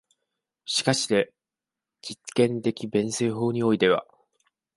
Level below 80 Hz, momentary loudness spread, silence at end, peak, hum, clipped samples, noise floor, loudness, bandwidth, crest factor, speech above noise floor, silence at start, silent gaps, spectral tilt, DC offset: -66 dBFS; 15 LU; 0.75 s; -6 dBFS; none; under 0.1%; -89 dBFS; -25 LUFS; 11.5 kHz; 20 dB; 65 dB; 0.65 s; none; -4.5 dB/octave; under 0.1%